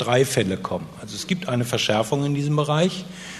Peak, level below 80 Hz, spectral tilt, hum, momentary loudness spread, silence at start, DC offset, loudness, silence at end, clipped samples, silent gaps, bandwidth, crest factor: -4 dBFS; -56 dBFS; -5 dB/octave; none; 11 LU; 0 s; under 0.1%; -23 LUFS; 0 s; under 0.1%; none; 13.5 kHz; 18 dB